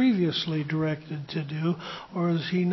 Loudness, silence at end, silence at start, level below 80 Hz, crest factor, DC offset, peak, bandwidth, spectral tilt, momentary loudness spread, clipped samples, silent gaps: -28 LUFS; 0 s; 0 s; -66 dBFS; 14 dB; under 0.1%; -12 dBFS; 6 kHz; -7.5 dB/octave; 8 LU; under 0.1%; none